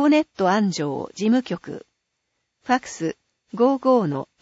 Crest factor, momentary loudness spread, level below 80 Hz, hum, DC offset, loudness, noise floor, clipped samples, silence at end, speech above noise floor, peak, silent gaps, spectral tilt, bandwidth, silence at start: 16 dB; 18 LU; -66 dBFS; none; under 0.1%; -22 LUFS; -76 dBFS; under 0.1%; 0.2 s; 55 dB; -6 dBFS; none; -6 dB/octave; 8 kHz; 0 s